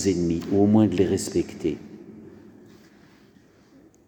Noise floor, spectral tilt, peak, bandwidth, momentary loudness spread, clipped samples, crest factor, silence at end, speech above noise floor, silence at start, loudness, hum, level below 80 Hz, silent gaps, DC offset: -55 dBFS; -6.5 dB/octave; -8 dBFS; 19.5 kHz; 25 LU; under 0.1%; 18 dB; 1.7 s; 33 dB; 0 s; -23 LUFS; none; -54 dBFS; none; under 0.1%